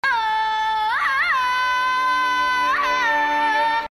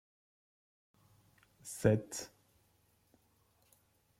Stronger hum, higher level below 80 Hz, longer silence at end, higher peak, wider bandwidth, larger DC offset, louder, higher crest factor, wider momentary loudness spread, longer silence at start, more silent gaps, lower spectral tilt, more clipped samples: neither; first, -54 dBFS vs -68 dBFS; second, 0.05 s vs 1.95 s; first, -10 dBFS vs -14 dBFS; second, 13 kHz vs 16 kHz; neither; first, -19 LUFS vs -35 LUFS; second, 10 dB vs 28 dB; second, 2 LU vs 21 LU; second, 0.05 s vs 1.65 s; neither; second, -1 dB/octave vs -6 dB/octave; neither